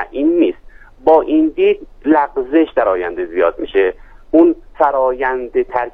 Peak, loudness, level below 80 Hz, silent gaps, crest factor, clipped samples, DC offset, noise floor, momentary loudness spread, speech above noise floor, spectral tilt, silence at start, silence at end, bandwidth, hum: 0 dBFS; -15 LUFS; -42 dBFS; none; 14 dB; under 0.1%; under 0.1%; -39 dBFS; 7 LU; 24 dB; -7.5 dB/octave; 0 s; 0.05 s; 3.8 kHz; none